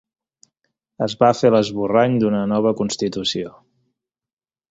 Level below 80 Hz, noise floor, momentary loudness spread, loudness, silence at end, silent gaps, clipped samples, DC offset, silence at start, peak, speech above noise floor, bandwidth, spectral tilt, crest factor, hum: -56 dBFS; under -90 dBFS; 10 LU; -19 LUFS; 1.2 s; none; under 0.1%; under 0.1%; 1 s; -2 dBFS; over 72 dB; 8 kHz; -5.5 dB/octave; 18 dB; none